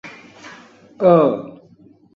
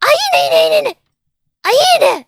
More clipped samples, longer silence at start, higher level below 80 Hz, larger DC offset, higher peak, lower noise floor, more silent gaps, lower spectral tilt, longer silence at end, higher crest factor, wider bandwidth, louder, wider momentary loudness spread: neither; about the same, 0.05 s vs 0 s; about the same, -62 dBFS vs -64 dBFS; neither; about the same, -2 dBFS vs 0 dBFS; second, -49 dBFS vs -70 dBFS; neither; first, -8.5 dB/octave vs -0.5 dB/octave; first, 0.65 s vs 0.05 s; first, 18 dB vs 12 dB; second, 7 kHz vs 16.5 kHz; second, -16 LUFS vs -11 LUFS; first, 26 LU vs 9 LU